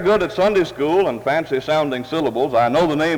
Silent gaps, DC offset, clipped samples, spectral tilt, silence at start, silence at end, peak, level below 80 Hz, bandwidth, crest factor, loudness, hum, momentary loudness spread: none; under 0.1%; under 0.1%; -6 dB/octave; 0 s; 0 s; -6 dBFS; -48 dBFS; 19.5 kHz; 12 dB; -18 LUFS; none; 4 LU